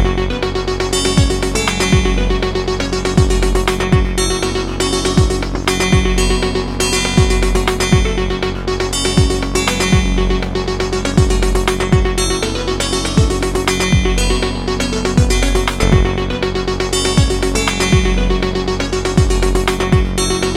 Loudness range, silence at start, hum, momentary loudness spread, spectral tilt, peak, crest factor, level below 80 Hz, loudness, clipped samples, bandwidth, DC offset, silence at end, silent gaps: 1 LU; 0 s; none; 5 LU; -4.5 dB/octave; 0 dBFS; 14 dB; -20 dBFS; -15 LUFS; under 0.1%; 14.5 kHz; 0.3%; 0 s; none